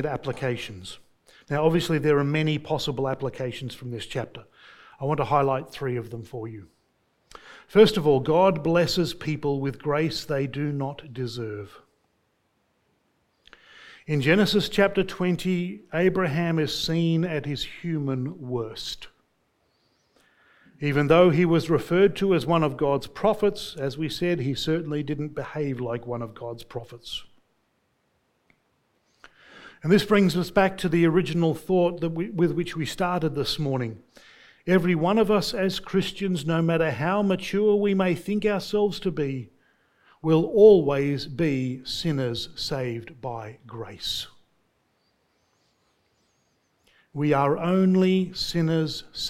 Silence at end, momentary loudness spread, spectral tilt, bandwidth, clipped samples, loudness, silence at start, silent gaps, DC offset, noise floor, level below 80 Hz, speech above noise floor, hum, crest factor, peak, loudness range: 0 s; 15 LU; -6.5 dB/octave; 16 kHz; under 0.1%; -24 LUFS; 0 s; none; under 0.1%; -71 dBFS; -52 dBFS; 47 dB; none; 22 dB; -4 dBFS; 12 LU